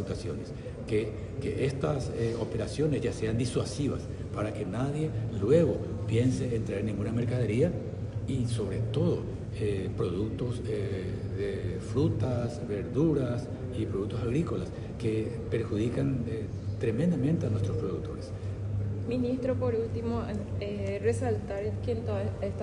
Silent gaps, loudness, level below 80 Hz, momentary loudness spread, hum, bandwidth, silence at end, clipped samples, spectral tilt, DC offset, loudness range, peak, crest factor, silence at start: none; -31 LUFS; -46 dBFS; 7 LU; none; 11 kHz; 0 s; under 0.1%; -7.5 dB/octave; under 0.1%; 3 LU; -10 dBFS; 20 dB; 0 s